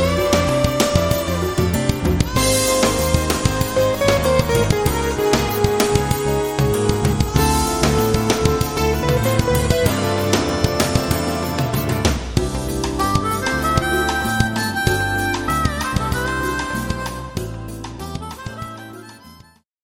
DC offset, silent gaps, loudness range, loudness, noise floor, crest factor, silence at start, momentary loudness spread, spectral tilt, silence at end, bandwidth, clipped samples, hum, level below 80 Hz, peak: under 0.1%; none; 5 LU; -18 LUFS; -48 dBFS; 18 dB; 0 s; 10 LU; -4.5 dB/octave; 0.5 s; 17.5 kHz; under 0.1%; none; -28 dBFS; 0 dBFS